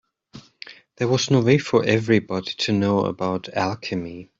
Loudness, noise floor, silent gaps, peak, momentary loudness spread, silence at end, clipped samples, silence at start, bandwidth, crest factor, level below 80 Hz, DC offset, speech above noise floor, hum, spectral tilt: -21 LUFS; -47 dBFS; none; -2 dBFS; 16 LU; 0.15 s; under 0.1%; 0.35 s; 7.8 kHz; 20 dB; -58 dBFS; under 0.1%; 26 dB; none; -5.5 dB/octave